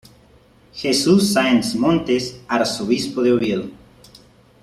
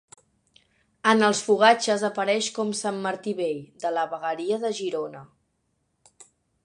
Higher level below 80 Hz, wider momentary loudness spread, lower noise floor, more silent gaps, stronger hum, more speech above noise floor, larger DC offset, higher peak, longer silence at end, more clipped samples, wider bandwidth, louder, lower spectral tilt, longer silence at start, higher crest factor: first, -52 dBFS vs -74 dBFS; about the same, 11 LU vs 11 LU; second, -51 dBFS vs -73 dBFS; neither; neither; second, 33 dB vs 49 dB; neither; about the same, -2 dBFS vs -4 dBFS; first, 0.9 s vs 0.4 s; neither; first, 14 kHz vs 11 kHz; first, -18 LUFS vs -24 LUFS; first, -4.5 dB/octave vs -3 dB/octave; second, 0.75 s vs 1.05 s; second, 16 dB vs 22 dB